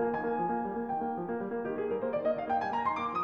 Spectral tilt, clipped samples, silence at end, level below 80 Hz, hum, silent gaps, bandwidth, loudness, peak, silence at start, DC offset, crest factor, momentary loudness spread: -8 dB/octave; under 0.1%; 0 s; -66 dBFS; none; none; 6.6 kHz; -33 LUFS; -18 dBFS; 0 s; under 0.1%; 14 dB; 4 LU